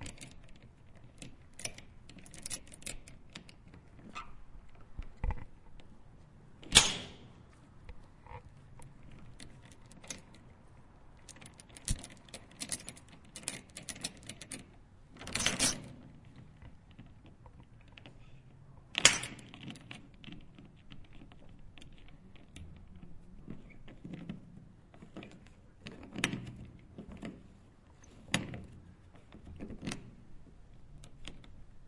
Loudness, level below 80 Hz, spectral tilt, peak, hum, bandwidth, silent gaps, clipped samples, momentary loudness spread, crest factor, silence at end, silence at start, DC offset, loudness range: -35 LUFS; -52 dBFS; -1.5 dB/octave; -4 dBFS; none; 11.5 kHz; none; under 0.1%; 23 LU; 38 dB; 0 s; 0 s; under 0.1%; 20 LU